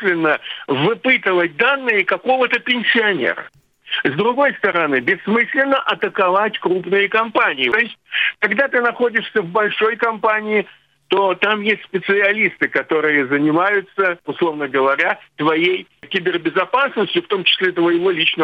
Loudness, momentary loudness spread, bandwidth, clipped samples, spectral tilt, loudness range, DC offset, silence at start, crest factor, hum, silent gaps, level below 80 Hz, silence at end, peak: -17 LUFS; 5 LU; 6.6 kHz; under 0.1%; -6.5 dB/octave; 2 LU; under 0.1%; 0 s; 18 dB; none; none; -68 dBFS; 0 s; 0 dBFS